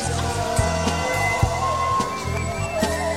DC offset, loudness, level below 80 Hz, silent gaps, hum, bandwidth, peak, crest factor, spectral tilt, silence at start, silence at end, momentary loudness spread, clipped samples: 0.4%; -22 LUFS; -34 dBFS; none; none; 16 kHz; -6 dBFS; 18 dB; -4.5 dB/octave; 0 s; 0 s; 4 LU; under 0.1%